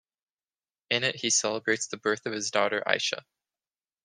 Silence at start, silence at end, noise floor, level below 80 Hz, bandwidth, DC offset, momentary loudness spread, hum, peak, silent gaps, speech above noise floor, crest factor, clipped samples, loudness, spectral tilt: 0.9 s; 0.85 s; under -90 dBFS; -76 dBFS; 11 kHz; under 0.1%; 5 LU; none; -4 dBFS; none; over 62 dB; 26 dB; under 0.1%; -27 LUFS; -1.5 dB/octave